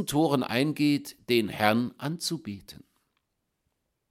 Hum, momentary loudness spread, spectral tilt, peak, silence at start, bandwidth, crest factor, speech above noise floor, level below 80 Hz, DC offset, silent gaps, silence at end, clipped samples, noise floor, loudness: none; 10 LU; -5 dB/octave; -6 dBFS; 0 s; 16.5 kHz; 24 dB; 51 dB; -64 dBFS; under 0.1%; none; 1.3 s; under 0.1%; -79 dBFS; -27 LUFS